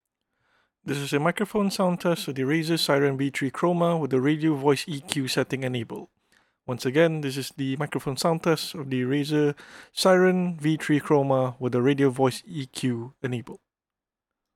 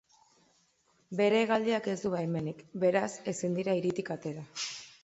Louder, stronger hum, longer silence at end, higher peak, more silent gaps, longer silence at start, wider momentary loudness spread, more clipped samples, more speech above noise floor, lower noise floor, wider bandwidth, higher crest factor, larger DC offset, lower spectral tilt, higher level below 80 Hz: first, -25 LUFS vs -32 LUFS; neither; first, 1 s vs 0.15 s; first, -4 dBFS vs -14 dBFS; neither; second, 0.85 s vs 1.1 s; about the same, 11 LU vs 11 LU; neither; first, over 66 dB vs 40 dB; first, under -90 dBFS vs -71 dBFS; first, 17 kHz vs 8.2 kHz; about the same, 22 dB vs 18 dB; neither; about the same, -5.5 dB/octave vs -5 dB/octave; about the same, -68 dBFS vs -72 dBFS